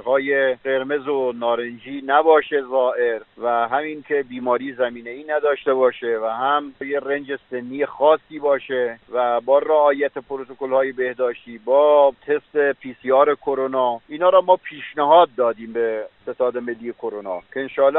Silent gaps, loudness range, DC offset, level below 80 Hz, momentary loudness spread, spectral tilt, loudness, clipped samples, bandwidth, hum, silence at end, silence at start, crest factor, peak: none; 4 LU; under 0.1%; -66 dBFS; 14 LU; -2 dB/octave; -20 LUFS; under 0.1%; 4.1 kHz; none; 0 s; 0.05 s; 18 dB; -2 dBFS